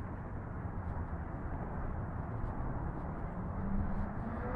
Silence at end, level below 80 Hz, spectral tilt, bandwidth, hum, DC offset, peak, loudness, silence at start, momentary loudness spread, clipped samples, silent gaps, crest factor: 0 s; -42 dBFS; -11 dB/octave; 3.5 kHz; none; under 0.1%; -22 dBFS; -41 LUFS; 0 s; 4 LU; under 0.1%; none; 16 dB